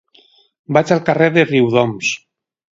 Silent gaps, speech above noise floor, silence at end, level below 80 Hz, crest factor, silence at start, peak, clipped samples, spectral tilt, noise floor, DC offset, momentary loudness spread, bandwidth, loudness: none; 38 dB; 0.65 s; -58 dBFS; 16 dB; 0.7 s; 0 dBFS; under 0.1%; -5.5 dB/octave; -52 dBFS; under 0.1%; 8 LU; 7.8 kHz; -15 LUFS